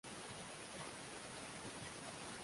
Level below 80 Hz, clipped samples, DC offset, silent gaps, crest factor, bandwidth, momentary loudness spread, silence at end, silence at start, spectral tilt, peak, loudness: -72 dBFS; under 0.1%; under 0.1%; none; 14 dB; 11.5 kHz; 1 LU; 0 s; 0.05 s; -2.5 dB/octave; -36 dBFS; -49 LUFS